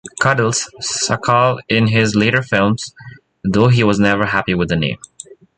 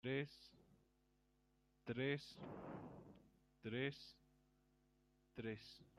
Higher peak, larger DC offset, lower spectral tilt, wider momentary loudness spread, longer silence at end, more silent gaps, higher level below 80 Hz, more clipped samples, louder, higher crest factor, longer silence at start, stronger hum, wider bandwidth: first, 0 dBFS vs -32 dBFS; neither; second, -5 dB/octave vs -6.5 dB/octave; second, 9 LU vs 18 LU; first, 0.6 s vs 0.15 s; neither; first, -44 dBFS vs -78 dBFS; neither; first, -15 LUFS vs -49 LUFS; about the same, 16 dB vs 20 dB; about the same, 0.05 s vs 0.05 s; neither; second, 9.4 kHz vs 13.5 kHz